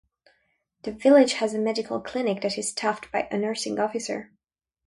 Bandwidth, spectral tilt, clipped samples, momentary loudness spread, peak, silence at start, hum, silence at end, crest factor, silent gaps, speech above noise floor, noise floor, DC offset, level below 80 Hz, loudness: 11.5 kHz; -4 dB/octave; under 0.1%; 14 LU; -6 dBFS; 0.85 s; none; 0.65 s; 20 dB; none; 47 dB; -71 dBFS; under 0.1%; -66 dBFS; -25 LUFS